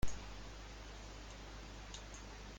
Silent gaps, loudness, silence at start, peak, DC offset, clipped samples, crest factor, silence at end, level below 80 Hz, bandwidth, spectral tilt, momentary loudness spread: none; -52 LUFS; 0 s; -22 dBFS; under 0.1%; under 0.1%; 20 dB; 0 s; -50 dBFS; 16.5 kHz; -4 dB/octave; 2 LU